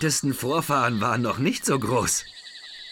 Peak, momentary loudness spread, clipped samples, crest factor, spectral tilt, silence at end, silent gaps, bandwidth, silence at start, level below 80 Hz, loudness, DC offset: -10 dBFS; 16 LU; under 0.1%; 14 dB; -4 dB/octave; 0 s; none; 18 kHz; 0 s; -54 dBFS; -24 LUFS; under 0.1%